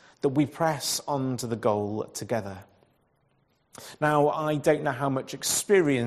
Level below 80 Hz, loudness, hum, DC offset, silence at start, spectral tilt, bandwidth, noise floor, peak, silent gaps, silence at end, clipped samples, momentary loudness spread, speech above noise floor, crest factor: -66 dBFS; -26 LUFS; none; under 0.1%; 0.25 s; -4.5 dB/octave; 14 kHz; -69 dBFS; -8 dBFS; none; 0 s; under 0.1%; 10 LU; 42 dB; 18 dB